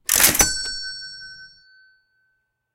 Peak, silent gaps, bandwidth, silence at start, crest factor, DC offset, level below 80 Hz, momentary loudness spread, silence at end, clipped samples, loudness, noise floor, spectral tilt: 0 dBFS; none; 17.5 kHz; 0.1 s; 24 dB; under 0.1%; -42 dBFS; 23 LU; 1.3 s; under 0.1%; -17 LUFS; -71 dBFS; 0 dB/octave